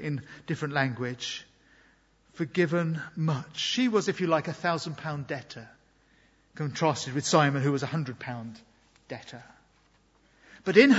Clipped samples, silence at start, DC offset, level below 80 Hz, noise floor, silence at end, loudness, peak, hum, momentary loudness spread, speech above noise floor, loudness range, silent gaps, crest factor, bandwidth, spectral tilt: under 0.1%; 0 s; under 0.1%; -68 dBFS; -64 dBFS; 0 s; -29 LUFS; -4 dBFS; none; 18 LU; 37 dB; 3 LU; none; 24 dB; 8 kHz; -5 dB/octave